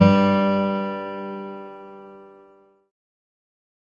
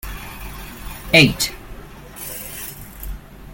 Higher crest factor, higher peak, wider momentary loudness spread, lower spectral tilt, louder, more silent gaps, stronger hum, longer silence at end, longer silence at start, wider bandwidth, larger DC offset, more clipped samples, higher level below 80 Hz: about the same, 22 dB vs 22 dB; about the same, -2 dBFS vs 0 dBFS; about the same, 24 LU vs 26 LU; first, -8.5 dB/octave vs -3.5 dB/octave; second, -22 LUFS vs -17 LUFS; neither; neither; first, 1.7 s vs 0 s; about the same, 0 s vs 0.05 s; second, 7 kHz vs 17 kHz; neither; neither; second, -60 dBFS vs -36 dBFS